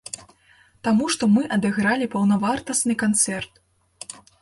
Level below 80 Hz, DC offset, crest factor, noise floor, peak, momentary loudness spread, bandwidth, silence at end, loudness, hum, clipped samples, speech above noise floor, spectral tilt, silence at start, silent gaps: -58 dBFS; under 0.1%; 16 dB; -57 dBFS; -6 dBFS; 18 LU; 11.5 kHz; 0.3 s; -21 LUFS; none; under 0.1%; 36 dB; -4 dB/octave; 0.2 s; none